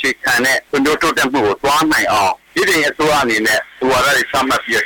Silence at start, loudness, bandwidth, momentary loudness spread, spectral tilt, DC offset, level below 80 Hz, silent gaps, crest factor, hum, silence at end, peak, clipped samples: 0 s; -14 LUFS; 19.5 kHz; 3 LU; -2.5 dB/octave; under 0.1%; -44 dBFS; none; 8 dB; none; 0 s; -8 dBFS; under 0.1%